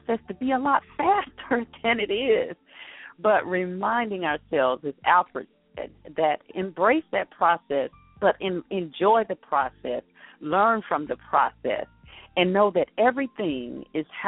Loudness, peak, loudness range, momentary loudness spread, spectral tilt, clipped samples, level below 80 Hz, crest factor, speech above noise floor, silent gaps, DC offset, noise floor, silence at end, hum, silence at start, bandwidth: -25 LUFS; -6 dBFS; 1 LU; 12 LU; -3 dB/octave; under 0.1%; -60 dBFS; 18 dB; 20 dB; none; under 0.1%; -45 dBFS; 0 s; none; 0.1 s; 4 kHz